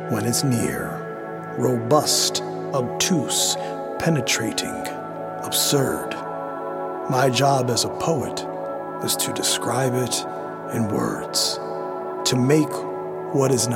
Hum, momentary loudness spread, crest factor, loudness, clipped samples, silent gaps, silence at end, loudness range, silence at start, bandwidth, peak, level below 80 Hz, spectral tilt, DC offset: none; 11 LU; 20 dB; -22 LUFS; under 0.1%; none; 0 s; 2 LU; 0 s; 17 kHz; -4 dBFS; -58 dBFS; -4 dB/octave; under 0.1%